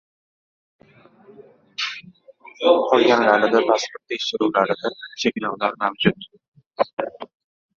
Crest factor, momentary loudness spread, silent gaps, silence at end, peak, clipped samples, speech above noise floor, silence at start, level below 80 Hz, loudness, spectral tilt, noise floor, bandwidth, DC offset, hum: 20 dB; 16 LU; 6.48-6.52 s, 6.67-6.71 s, 6.93-6.97 s; 0.5 s; -2 dBFS; under 0.1%; 32 dB; 1.8 s; -64 dBFS; -20 LUFS; -4.5 dB/octave; -52 dBFS; 7.6 kHz; under 0.1%; none